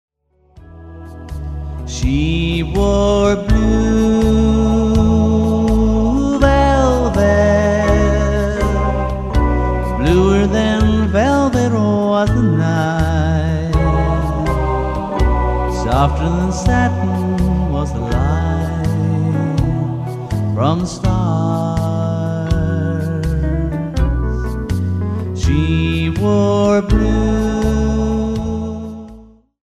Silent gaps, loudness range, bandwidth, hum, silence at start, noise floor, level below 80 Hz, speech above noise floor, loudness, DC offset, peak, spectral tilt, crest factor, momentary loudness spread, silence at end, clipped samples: none; 4 LU; 12.5 kHz; none; 0.55 s; -47 dBFS; -22 dBFS; 33 dB; -16 LUFS; 0.1%; 0 dBFS; -7 dB/octave; 14 dB; 7 LU; 0.45 s; under 0.1%